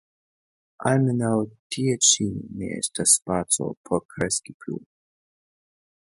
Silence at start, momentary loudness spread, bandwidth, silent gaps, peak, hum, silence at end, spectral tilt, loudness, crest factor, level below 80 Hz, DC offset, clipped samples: 0.8 s; 15 LU; 12 kHz; 1.59-1.70 s, 3.77-3.84 s, 4.05-4.09 s, 4.54-4.60 s; -2 dBFS; none; 1.3 s; -3.5 dB/octave; -23 LUFS; 24 dB; -56 dBFS; under 0.1%; under 0.1%